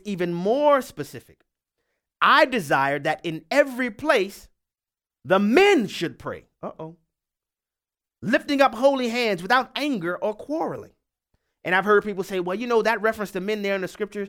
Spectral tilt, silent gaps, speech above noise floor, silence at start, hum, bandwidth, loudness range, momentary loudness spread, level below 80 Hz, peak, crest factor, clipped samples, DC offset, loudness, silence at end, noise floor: -5 dB/octave; none; over 68 dB; 0.05 s; none; 17.5 kHz; 3 LU; 17 LU; -62 dBFS; -2 dBFS; 20 dB; under 0.1%; under 0.1%; -22 LUFS; 0 s; under -90 dBFS